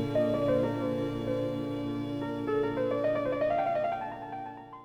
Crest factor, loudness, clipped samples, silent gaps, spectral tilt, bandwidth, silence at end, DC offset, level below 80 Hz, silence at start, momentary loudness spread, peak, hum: 14 dB; -31 LUFS; under 0.1%; none; -8 dB/octave; 13 kHz; 0 s; under 0.1%; -58 dBFS; 0 s; 10 LU; -18 dBFS; none